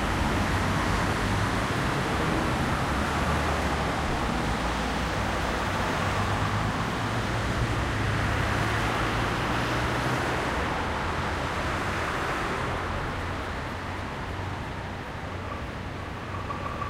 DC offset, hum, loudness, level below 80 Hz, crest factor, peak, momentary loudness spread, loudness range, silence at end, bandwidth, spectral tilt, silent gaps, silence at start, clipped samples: under 0.1%; none; -28 LUFS; -36 dBFS; 14 dB; -14 dBFS; 8 LU; 6 LU; 0 s; 16 kHz; -5 dB/octave; none; 0 s; under 0.1%